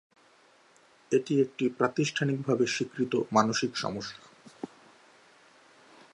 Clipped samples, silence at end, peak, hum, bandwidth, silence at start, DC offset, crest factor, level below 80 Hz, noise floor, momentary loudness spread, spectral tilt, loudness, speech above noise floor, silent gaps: under 0.1%; 1.5 s; -8 dBFS; none; 11 kHz; 1.1 s; under 0.1%; 24 dB; -72 dBFS; -61 dBFS; 19 LU; -5 dB/octave; -29 LUFS; 33 dB; none